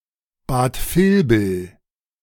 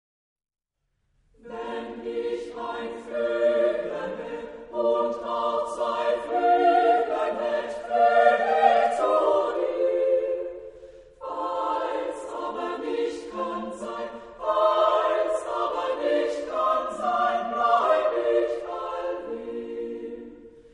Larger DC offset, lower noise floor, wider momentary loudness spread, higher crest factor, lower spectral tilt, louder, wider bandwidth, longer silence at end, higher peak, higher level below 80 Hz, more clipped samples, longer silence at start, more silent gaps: neither; second, -37 dBFS vs -76 dBFS; first, 17 LU vs 14 LU; about the same, 16 dB vs 20 dB; first, -6.5 dB/octave vs -4 dB/octave; first, -19 LUFS vs -25 LUFS; first, 18 kHz vs 10.5 kHz; first, 0.55 s vs 0.15 s; about the same, -4 dBFS vs -6 dBFS; first, -36 dBFS vs -62 dBFS; neither; second, 0.5 s vs 1.45 s; neither